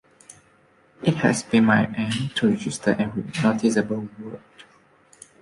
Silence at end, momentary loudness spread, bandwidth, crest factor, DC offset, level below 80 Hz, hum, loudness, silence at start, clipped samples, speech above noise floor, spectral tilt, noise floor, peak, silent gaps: 0.8 s; 14 LU; 11.5 kHz; 20 dB; under 0.1%; -58 dBFS; none; -22 LUFS; 0.3 s; under 0.1%; 36 dB; -5.5 dB/octave; -58 dBFS; -4 dBFS; none